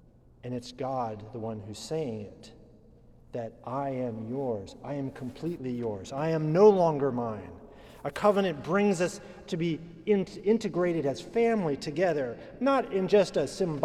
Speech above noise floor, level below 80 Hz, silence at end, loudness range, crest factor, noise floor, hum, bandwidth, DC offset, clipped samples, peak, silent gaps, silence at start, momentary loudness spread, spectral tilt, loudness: 27 dB; -60 dBFS; 0 s; 10 LU; 20 dB; -55 dBFS; none; 12.5 kHz; under 0.1%; under 0.1%; -10 dBFS; none; 0.45 s; 14 LU; -6.5 dB/octave; -29 LUFS